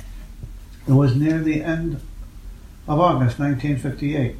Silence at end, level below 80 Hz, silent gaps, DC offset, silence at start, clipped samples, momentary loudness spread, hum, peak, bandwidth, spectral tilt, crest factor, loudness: 0 s; -38 dBFS; none; under 0.1%; 0 s; under 0.1%; 23 LU; none; -4 dBFS; 13 kHz; -8.5 dB/octave; 18 dB; -20 LUFS